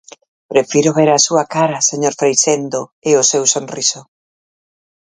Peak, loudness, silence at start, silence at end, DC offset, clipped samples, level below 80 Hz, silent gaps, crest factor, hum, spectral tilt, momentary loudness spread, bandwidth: 0 dBFS; -14 LUFS; 0.5 s; 1.05 s; under 0.1%; under 0.1%; -62 dBFS; 2.92-3.02 s; 16 dB; none; -3 dB/octave; 7 LU; 10 kHz